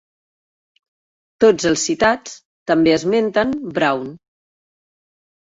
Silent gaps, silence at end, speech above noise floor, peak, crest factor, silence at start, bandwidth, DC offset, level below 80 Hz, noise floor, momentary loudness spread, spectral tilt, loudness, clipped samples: 2.45-2.66 s; 1.25 s; over 73 dB; -2 dBFS; 18 dB; 1.4 s; 8 kHz; under 0.1%; -54 dBFS; under -90 dBFS; 11 LU; -4 dB/octave; -17 LUFS; under 0.1%